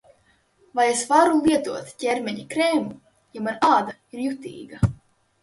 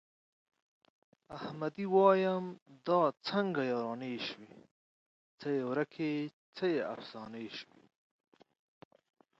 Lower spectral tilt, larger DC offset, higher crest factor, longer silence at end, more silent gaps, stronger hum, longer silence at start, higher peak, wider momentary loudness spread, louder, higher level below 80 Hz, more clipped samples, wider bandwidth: second, -5 dB/octave vs -7 dB/octave; neither; about the same, 18 dB vs 22 dB; second, 0.45 s vs 1.75 s; second, none vs 2.62-2.66 s, 4.71-5.38 s, 6.33-6.53 s; neither; second, 0.75 s vs 1.3 s; first, -4 dBFS vs -14 dBFS; second, 15 LU vs 18 LU; first, -22 LUFS vs -34 LUFS; first, -48 dBFS vs -82 dBFS; neither; first, 11.5 kHz vs 7.6 kHz